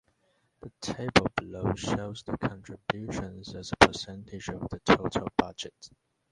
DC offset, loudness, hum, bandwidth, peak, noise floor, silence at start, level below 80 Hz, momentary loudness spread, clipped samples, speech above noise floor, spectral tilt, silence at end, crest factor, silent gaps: under 0.1%; -29 LUFS; none; 11.5 kHz; 0 dBFS; -72 dBFS; 0.65 s; -50 dBFS; 17 LU; under 0.1%; 42 dB; -4.5 dB/octave; 0.45 s; 30 dB; none